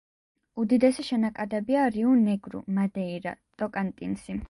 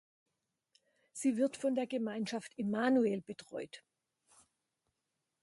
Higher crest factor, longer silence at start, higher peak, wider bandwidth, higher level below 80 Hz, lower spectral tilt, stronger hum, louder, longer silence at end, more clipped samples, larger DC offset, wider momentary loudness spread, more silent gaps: about the same, 18 dB vs 20 dB; second, 0.55 s vs 1.15 s; first, -10 dBFS vs -18 dBFS; about the same, 11.5 kHz vs 11.5 kHz; first, -56 dBFS vs -82 dBFS; first, -7 dB/octave vs -5 dB/octave; neither; first, -27 LUFS vs -35 LUFS; second, 0.05 s vs 1.65 s; neither; neither; second, 12 LU vs 15 LU; neither